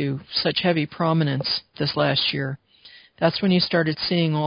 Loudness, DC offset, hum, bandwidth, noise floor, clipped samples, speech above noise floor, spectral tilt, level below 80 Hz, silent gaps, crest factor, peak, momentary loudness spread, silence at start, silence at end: -22 LUFS; under 0.1%; none; 5.4 kHz; -50 dBFS; under 0.1%; 28 dB; -10 dB/octave; -58 dBFS; none; 20 dB; -4 dBFS; 6 LU; 0 s; 0 s